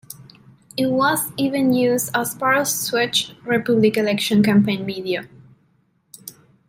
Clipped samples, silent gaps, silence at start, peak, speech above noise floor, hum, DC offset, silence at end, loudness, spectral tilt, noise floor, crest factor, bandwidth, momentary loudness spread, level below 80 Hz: under 0.1%; none; 0.1 s; -4 dBFS; 44 dB; none; under 0.1%; 0.4 s; -19 LUFS; -4 dB/octave; -62 dBFS; 16 dB; 16 kHz; 20 LU; -62 dBFS